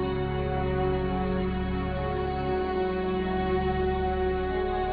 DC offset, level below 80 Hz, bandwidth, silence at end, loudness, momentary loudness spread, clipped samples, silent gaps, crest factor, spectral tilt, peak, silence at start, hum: under 0.1%; -36 dBFS; 5 kHz; 0 s; -28 LUFS; 3 LU; under 0.1%; none; 12 dB; -10.5 dB/octave; -16 dBFS; 0 s; none